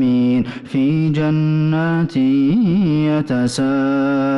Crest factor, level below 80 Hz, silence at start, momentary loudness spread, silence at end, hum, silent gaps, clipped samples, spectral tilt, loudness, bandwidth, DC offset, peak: 6 dB; -48 dBFS; 0 s; 3 LU; 0 s; none; none; under 0.1%; -7.5 dB/octave; -16 LUFS; 11.5 kHz; under 0.1%; -10 dBFS